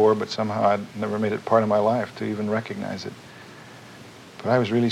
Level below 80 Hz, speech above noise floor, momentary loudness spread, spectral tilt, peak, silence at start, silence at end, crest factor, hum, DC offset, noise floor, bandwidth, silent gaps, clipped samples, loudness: -68 dBFS; 21 dB; 22 LU; -6.5 dB/octave; -4 dBFS; 0 s; 0 s; 20 dB; none; under 0.1%; -44 dBFS; 13.5 kHz; none; under 0.1%; -24 LUFS